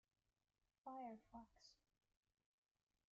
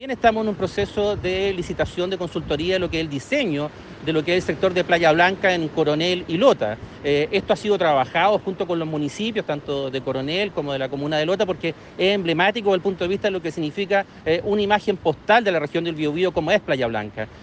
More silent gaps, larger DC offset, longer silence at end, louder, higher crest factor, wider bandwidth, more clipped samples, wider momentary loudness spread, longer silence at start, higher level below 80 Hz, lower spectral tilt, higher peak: neither; neither; first, 1.35 s vs 0 s; second, -59 LUFS vs -22 LUFS; about the same, 18 dB vs 18 dB; second, 7.2 kHz vs 9.2 kHz; neither; about the same, 9 LU vs 8 LU; first, 0.85 s vs 0 s; second, -86 dBFS vs -48 dBFS; second, -4 dB/octave vs -5.5 dB/octave; second, -44 dBFS vs -4 dBFS